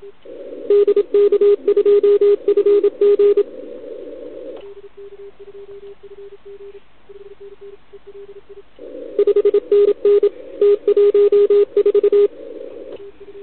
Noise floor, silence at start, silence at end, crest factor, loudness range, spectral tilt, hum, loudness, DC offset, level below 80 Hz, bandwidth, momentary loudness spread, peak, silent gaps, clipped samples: -42 dBFS; 0 s; 0 s; 12 dB; 20 LU; -9.5 dB/octave; none; -15 LUFS; 0.9%; -60 dBFS; 4.2 kHz; 21 LU; -6 dBFS; none; under 0.1%